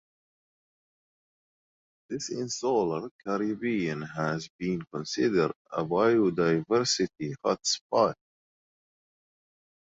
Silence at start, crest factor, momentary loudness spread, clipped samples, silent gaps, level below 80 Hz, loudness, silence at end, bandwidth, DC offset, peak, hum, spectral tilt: 2.1 s; 20 dB; 10 LU; under 0.1%; 3.11-3.19 s, 4.50-4.59 s, 5.56-5.65 s, 7.81-7.90 s; -66 dBFS; -28 LUFS; 1.75 s; 8 kHz; under 0.1%; -10 dBFS; none; -4.5 dB/octave